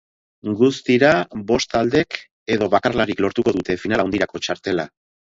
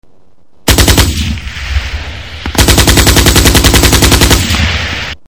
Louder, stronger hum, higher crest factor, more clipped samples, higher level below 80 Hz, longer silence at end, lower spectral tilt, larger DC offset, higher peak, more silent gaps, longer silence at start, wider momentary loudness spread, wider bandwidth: second, -19 LUFS vs -7 LUFS; neither; first, 20 dB vs 8 dB; second, under 0.1% vs 3%; second, -50 dBFS vs -14 dBFS; first, 0.55 s vs 0.15 s; first, -5 dB/octave vs -3.5 dB/octave; second, under 0.1% vs 1%; about the same, 0 dBFS vs 0 dBFS; first, 2.31-2.46 s vs none; second, 0.45 s vs 0.65 s; second, 10 LU vs 13 LU; second, 7.8 kHz vs 16 kHz